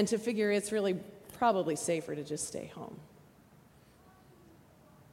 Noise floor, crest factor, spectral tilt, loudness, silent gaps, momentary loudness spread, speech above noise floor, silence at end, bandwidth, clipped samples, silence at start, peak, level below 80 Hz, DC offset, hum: -60 dBFS; 20 dB; -4.5 dB/octave; -33 LUFS; none; 17 LU; 28 dB; 2.05 s; 16.5 kHz; under 0.1%; 0 s; -14 dBFS; -72 dBFS; under 0.1%; none